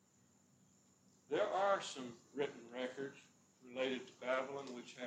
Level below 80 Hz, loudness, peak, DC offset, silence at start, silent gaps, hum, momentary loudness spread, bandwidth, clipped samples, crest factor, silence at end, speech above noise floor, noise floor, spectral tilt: under -90 dBFS; -42 LUFS; -24 dBFS; under 0.1%; 1.3 s; none; none; 14 LU; 10.5 kHz; under 0.1%; 20 dB; 0 s; 29 dB; -72 dBFS; -3.5 dB/octave